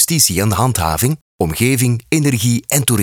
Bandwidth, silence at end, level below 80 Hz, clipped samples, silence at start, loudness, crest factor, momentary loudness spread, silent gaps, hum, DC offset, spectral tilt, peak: over 20 kHz; 0 s; -40 dBFS; under 0.1%; 0 s; -15 LUFS; 14 dB; 6 LU; 1.21-1.39 s; none; under 0.1%; -4 dB/octave; 0 dBFS